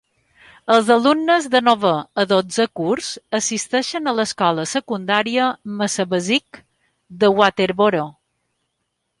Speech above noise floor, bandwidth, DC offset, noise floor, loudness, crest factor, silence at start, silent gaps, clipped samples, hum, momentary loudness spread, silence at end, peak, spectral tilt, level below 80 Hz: 56 dB; 11.5 kHz; under 0.1%; -74 dBFS; -18 LUFS; 18 dB; 0.65 s; none; under 0.1%; none; 8 LU; 1.1 s; -2 dBFS; -3.5 dB/octave; -62 dBFS